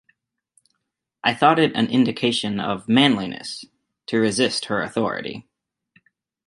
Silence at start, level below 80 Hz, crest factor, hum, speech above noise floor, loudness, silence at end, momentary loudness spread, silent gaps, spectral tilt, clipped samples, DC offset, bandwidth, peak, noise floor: 1.25 s; -62 dBFS; 22 dB; none; 58 dB; -20 LUFS; 1.05 s; 16 LU; none; -4.5 dB/octave; under 0.1%; under 0.1%; 11.5 kHz; -2 dBFS; -79 dBFS